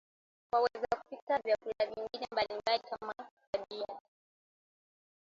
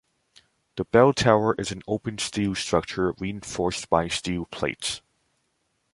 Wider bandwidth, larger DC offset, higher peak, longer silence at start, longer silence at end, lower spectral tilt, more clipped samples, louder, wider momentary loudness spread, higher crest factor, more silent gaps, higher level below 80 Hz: second, 7.8 kHz vs 11.5 kHz; neither; second, -18 dBFS vs -2 dBFS; second, 0.55 s vs 0.75 s; first, 1.25 s vs 0.95 s; about the same, -3.5 dB/octave vs -4.5 dB/octave; neither; second, -36 LUFS vs -25 LUFS; about the same, 11 LU vs 12 LU; about the same, 20 dB vs 24 dB; first, 1.22-1.27 s, 3.31-3.37 s, 3.47-3.53 s vs none; second, -72 dBFS vs -50 dBFS